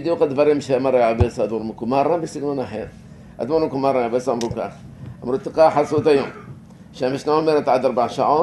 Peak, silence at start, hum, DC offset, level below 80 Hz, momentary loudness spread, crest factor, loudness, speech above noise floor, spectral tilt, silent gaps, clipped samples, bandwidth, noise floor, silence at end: -2 dBFS; 0 s; none; under 0.1%; -42 dBFS; 14 LU; 18 dB; -20 LUFS; 21 dB; -6.5 dB/octave; none; under 0.1%; 12 kHz; -40 dBFS; 0 s